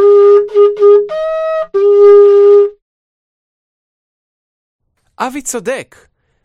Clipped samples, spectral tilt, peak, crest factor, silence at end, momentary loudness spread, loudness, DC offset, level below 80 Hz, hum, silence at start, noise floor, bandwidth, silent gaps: under 0.1%; -3.5 dB/octave; 0 dBFS; 10 dB; 0.6 s; 15 LU; -9 LUFS; under 0.1%; -54 dBFS; none; 0 s; under -90 dBFS; 12 kHz; 2.82-4.79 s